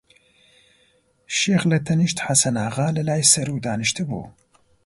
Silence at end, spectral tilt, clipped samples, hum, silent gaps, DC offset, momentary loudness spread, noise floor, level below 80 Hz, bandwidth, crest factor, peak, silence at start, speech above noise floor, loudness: 0.55 s; -3.5 dB/octave; under 0.1%; none; none; under 0.1%; 10 LU; -61 dBFS; -56 dBFS; 12 kHz; 20 dB; -2 dBFS; 1.3 s; 41 dB; -20 LUFS